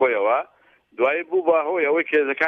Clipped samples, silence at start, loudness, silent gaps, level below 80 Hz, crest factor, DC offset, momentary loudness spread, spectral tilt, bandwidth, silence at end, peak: under 0.1%; 0 s; -21 LUFS; none; -78 dBFS; 14 dB; under 0.1%; 4 LU; -6 dB/octave; 4.7 kHz; 0 s; -6 dBFS